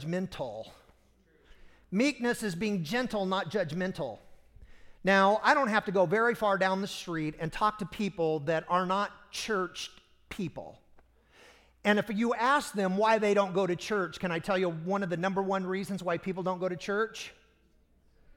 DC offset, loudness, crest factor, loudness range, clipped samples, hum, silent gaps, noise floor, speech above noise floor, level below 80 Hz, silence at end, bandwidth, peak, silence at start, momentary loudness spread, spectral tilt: under 0.1%; -30 LUFS; 20 dB; 6 LU; under 0.1%; none; none; -66 dBFS; 36 dB; -60 dBFS; 1.05 s; 16.5 kHz; -10 dBFS; 0 s; 13 LU; -5 dB/octave